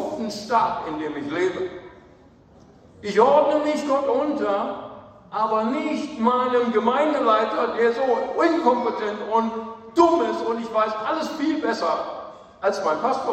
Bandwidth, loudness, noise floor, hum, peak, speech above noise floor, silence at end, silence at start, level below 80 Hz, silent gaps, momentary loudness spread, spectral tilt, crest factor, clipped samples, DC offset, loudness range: 12.5 kHz; -22 LUFS; -51 dBFS; none; -4 dBFS; 29 dB; 0 s; 0 s; -62 dBFS; none; 11 LU; -5 dB/octave; 18 dB; under 0.1%; under 0.1%; 3 LU